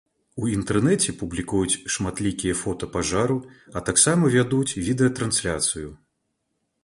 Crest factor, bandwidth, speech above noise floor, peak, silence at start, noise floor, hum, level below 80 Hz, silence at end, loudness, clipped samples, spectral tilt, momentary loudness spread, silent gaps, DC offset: 20 dB; 11.5 kHz; 52 dB; -4 dBFS; 0.35 s; -75 dBFS; none; -46 dBFS; 0.9 s; -23 LUFS; under 0.1%; -4 dB/octave; 12 LU; none; under 0.1%